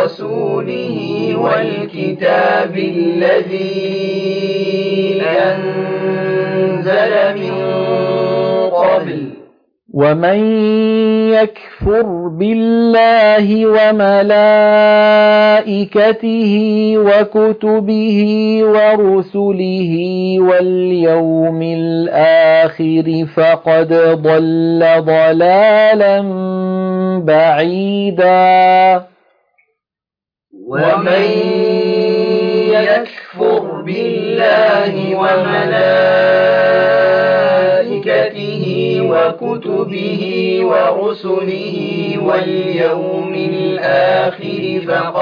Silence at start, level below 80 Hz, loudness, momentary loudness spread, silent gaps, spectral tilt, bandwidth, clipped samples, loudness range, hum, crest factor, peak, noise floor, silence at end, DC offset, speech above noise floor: 0 s; -48 dBFS; -12 LUFS; 9 LU; none; -8 dB/octave; 5.2 kHz; under 0.1%; 6 LU; none; 12 dB; 0 dBFS; -88 dBFS; 0 s; under 0.1%; 77 dB